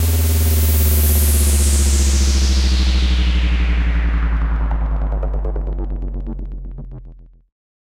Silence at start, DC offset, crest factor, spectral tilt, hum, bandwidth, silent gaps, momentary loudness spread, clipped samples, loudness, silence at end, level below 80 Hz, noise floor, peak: 0 s; under 0.1%; 12 dB; -4.5 dB/octave; none; 16.5 kHz; none; 14 LU; under 0.1%; -17 LUFS; 0.7 s; -16 dBFS; -39 dBFS; -4 dBFS